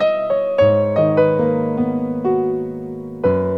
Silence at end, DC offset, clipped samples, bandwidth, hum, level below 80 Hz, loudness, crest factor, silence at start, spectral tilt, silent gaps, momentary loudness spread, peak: 0 s; 0.2%; under 0.1%; 6.2 kHz; none; -52 dBFS; -18 LUFS; 14 dB; 0 s; -9.5 dB/octave; none; 9 LU; -4 dBFS